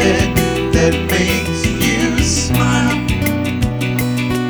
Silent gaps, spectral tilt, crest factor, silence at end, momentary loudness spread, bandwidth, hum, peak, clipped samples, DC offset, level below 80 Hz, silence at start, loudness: none; -4.5 dB/octave; 14 dB; 0 s; 4 LU; over 20 kHz; none; 0 dBFS; under 0.1%; under 0.1%; -26 dBFS; 0 s; -15 LUFS